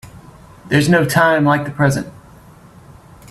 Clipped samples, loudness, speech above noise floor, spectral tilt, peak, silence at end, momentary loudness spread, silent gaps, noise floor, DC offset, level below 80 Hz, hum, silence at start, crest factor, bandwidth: under 0.1%; -15 LUFS; 28 dB; -6 dB/octave; 0 dBFS; 1.2 s; 8 LU; none; -42 dBFS; under 0.1%; -48 dBFS; none; 0.05 s; 16 dB; 14 kHz